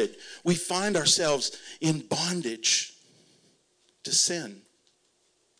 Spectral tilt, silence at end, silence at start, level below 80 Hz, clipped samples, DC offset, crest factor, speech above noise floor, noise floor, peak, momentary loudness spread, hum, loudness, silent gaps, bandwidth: -2.5 dB/octave; 1 s; 0 s; -70 dBFS; under 0.1%; under 0.1%; 20 dB; 42 dB; -69 dBFS; -10 dBFS; 12 LU; none; -26 LUFS; none; 10.5 kHz